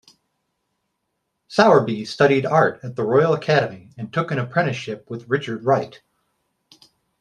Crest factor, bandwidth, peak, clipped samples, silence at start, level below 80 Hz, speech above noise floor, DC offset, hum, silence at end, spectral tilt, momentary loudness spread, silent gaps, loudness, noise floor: 22 dB; 10 kHz; 0 dBFS; under 0.1%; 1.5 s; -64 dBFS; 56 dB; under 0.1%; none; 1.3 s; -6.5 dB/octave; 14 LU; none; -20 LUFS; -76 dBFS